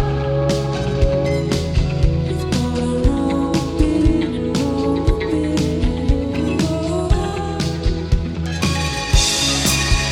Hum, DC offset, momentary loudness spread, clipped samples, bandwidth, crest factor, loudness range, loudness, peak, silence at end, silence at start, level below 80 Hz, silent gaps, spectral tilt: none; under 0.1%; 5 LU; under 0.1%; 17.5 kHz; 16 dB; 2 LU; -19 LUFS; -2 dBFS; 0 s; 0 s; -24 dBFS; none; -5 dB/octave